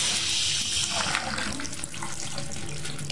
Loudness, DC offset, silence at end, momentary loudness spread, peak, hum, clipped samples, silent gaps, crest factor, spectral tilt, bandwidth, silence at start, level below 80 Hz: -27 LUFS; 1%; 0 s; 11 LU; -6 dBFS; none; under 0.1%; none; 24 dB; -1 dB/octave; 11.5 kHz; 0 s; -52 dBFS